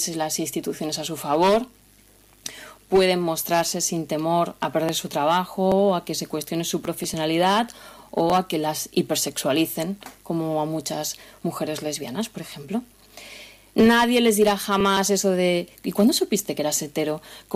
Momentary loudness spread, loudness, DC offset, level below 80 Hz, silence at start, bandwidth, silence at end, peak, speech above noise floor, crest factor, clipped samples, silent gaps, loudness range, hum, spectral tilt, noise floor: 12 LU; -23 LUFS; under 0.1%; -56 dBFS; 0 s; 16 kHz; 0 s; -8 dBFS; 31 dB; 16 dB; under 0.1%; none; 6 LU; none; -4 dB/octave; -54 dBFS